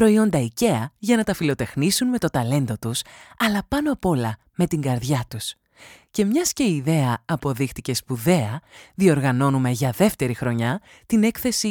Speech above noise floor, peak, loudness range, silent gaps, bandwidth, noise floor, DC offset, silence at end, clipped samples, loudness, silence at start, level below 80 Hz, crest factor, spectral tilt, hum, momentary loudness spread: 28 dB; -4 dBFS; 3 LU; none; over 20 kHz; -49 dBFS; under 0.1%; 0 s; under 0.1%; -22 LUFS; 0 s; -50 dBFS; 18 dB; -5.5 dB/octave; none; 8 LU